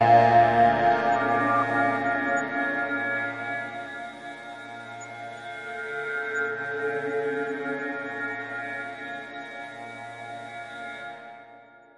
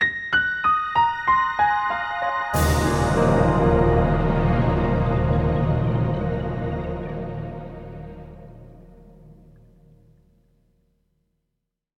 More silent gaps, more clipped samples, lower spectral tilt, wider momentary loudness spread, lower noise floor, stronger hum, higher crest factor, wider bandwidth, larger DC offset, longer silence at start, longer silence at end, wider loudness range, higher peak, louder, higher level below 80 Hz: neither; neither; about the same, -6 dB/octave vs -6.5 dB/octave; first, 19 LU vs 15 LU; second, -51 dBFS vs -79 dBFS; neither; about the same, 20 dB vs 16 dB; second, 11 kHz vs 16 kHz; neither; about the same, 0 s vs 0 s; second, 0.35 s vs 2.65 s; second, 11 LU vs 16 LU; about the same, -8 dBFS vs -6 dBFS; second, -25 LUFS vs -21 LUFS; second, -64 dBFS vs -34 dBFS